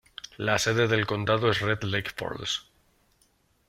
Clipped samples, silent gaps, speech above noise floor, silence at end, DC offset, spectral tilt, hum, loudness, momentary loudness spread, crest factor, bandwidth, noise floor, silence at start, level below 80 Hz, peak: under 0.1%; none; 40 dB; 1.05 s; under 0.1%; -4.5 dB/octave; none; -27 LUFS; 9 LU; 20 dB; 16 kHz; -67 dBFS; 0.25 s; -58 dBFS; -8 dBFS